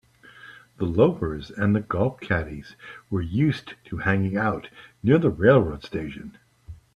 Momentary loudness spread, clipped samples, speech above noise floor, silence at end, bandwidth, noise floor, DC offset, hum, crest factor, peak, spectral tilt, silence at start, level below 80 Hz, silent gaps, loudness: 21 LU; under 0.1%; 25 dB; 0.2 s; 11 kHz; -48 dBFS; under 0.1%; none; 20 dB; -4 dBFS; -8.5 dB/octave; 0.45 s; -48 dBFS; none; -24 LUFS